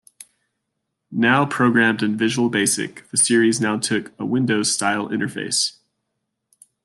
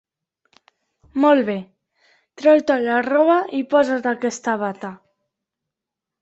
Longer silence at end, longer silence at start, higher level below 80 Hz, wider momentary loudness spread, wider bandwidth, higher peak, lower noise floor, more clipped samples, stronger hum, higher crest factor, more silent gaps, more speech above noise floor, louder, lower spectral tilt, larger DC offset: about the same, 1.15 s vs 1.25 s; about the same, 1.1 s vs 1.15 s; about the same, -66 dBFS vs -66 dBFS; second, 8 LU vs 13 LU; first, 12.5 kHz vs 8.2 kHz; about the same, -4 dBFS vs -4 dBFS; second, -77 dBFS vs -85 dBFS; neither; neither; about the same, 18 dB vs 18 dB; neither; second, 58 dB vs 67 dB; about the same, -19 LUFS vs -19 LUFS; second, -3.5 dB/octave vs -5 dB/octave; neither